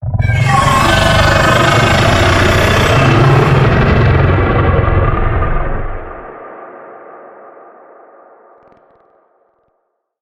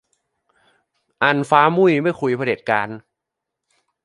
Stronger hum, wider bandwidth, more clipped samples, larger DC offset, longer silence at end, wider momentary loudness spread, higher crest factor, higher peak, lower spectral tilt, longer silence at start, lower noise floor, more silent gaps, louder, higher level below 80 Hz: neither; first, 14.5 kHz vs 11.5 kHz; neither; neither; first, 3 s vs 1.05 s; first, 19 LU vs 7 LU; second, 10 dB vs 20 dB; about the same, -2 dBFS vs 0 dBFS; about the same, -5.5 dB/octave vs -6.5 dB/octave; second, 0 s vs 1.2 s; second, -66 dBFS vs -82 dBFS; neither; first, -10 LUFS vs -18 LUFS; first, -22 dBFS vs -66 dBFS